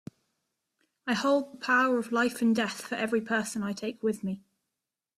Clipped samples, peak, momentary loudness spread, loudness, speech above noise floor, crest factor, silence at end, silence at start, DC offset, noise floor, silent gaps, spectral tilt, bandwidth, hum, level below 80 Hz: under 0.1%; -14 dBFS; 10 LU; -29 LUFS; 59 dB; 16 dB; 0.8 s; 1.05 s; under 0.1%; -88 dBFS; none; -4.5 dB/octave; 14 kHz; none; -74 dBFS